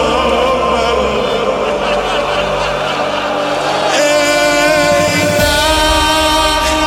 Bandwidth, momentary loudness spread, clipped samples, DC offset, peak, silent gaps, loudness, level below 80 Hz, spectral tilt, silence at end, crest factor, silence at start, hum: 17 kHz; 5 LU; under 0.1%; under 0.1%; 0 dBFS; none; -12 LUFS; -28 dBFS; -3 dB/octave; 0 s; 12 dB; 0 s; none